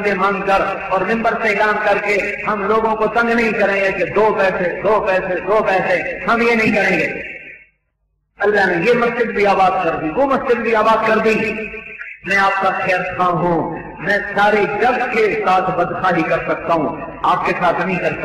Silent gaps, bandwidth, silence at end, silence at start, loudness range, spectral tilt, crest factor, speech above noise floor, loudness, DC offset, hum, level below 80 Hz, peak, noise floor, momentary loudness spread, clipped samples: none; 14 kHz; 0 s; 0 s; 2 LU; -6 dB/octave; 10 dB; 51 dB; -16 LUFS; under 0.1%; none; -46 dBFS; -6 dBFS; -67 dBFS; 5 LU; under 0.1%